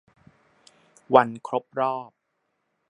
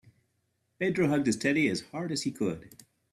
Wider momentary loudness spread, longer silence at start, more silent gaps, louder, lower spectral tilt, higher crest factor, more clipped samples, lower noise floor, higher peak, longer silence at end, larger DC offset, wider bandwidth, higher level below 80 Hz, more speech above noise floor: first, 11 LU vs 8 LU; first, 1.1 s vs 0.8 s; neither; first, -24 LUFS vs -29 LUFS; first, -6.5 dB/octave vs -5 dB/octave; first, 26 dB vs 18 dB; neither; about the same, -76 dBFS vs -76 dBFS; first, 0 dBFS vs -12 dBFS; first, 0.85 s vs 0.45 s; neither; second, 10.5 kHz vs 13.5 kHz; second, -72 dBFS vs -66 dBFS; first, 53 dB vs 47 dB